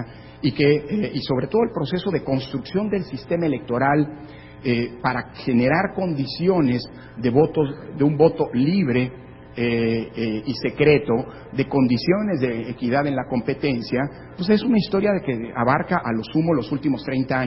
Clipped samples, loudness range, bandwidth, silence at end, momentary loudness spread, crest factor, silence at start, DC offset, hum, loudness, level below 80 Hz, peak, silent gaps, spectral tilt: under 0.1%; 3 LU; 5.8 kHz; 0 s; 8 LU; 18 dB; 0 s; under 0.1%; none; -22 LUFS; -48 dBFS; -2 dBFS; none; -11 dB/octave